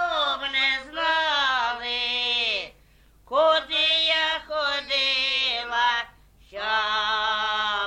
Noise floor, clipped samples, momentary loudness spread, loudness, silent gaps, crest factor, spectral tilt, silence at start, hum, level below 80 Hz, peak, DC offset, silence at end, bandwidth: -56 dBFS; under 0.1%; 6 LU; -23 LUFS; none; 16 dB; -0.5 dB/octave; 0 s; none; -56 dBFS; -10 dBFS; under 0.1%; 0 s; 11.5 kHz